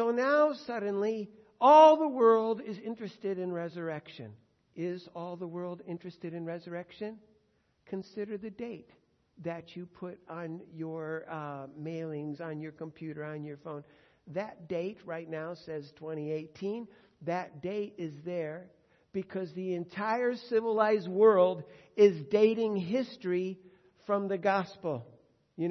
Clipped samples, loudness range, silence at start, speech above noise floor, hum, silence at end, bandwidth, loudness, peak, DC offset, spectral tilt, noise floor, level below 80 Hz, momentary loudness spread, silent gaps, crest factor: under 0.1%; 16 LU; 0 s; 41 dB; none; 0 s; 6.4 kHz; -31 LUFS; -8 dBFS; under 0.1%; -7 dB/octave; -72 dBFS; -80 dBFS; 18 LU; none; 22 dB